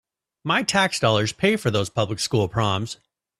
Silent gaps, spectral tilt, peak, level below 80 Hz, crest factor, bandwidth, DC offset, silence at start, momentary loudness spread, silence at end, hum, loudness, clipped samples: none; -4.5 dB/octave; -4 dBFS; -52 dBFS; 18 dB; 14 kHz; under 0.1%; 0.45 s; 9 LU; 0.45 s; none; -22 LUFS; under 0.1%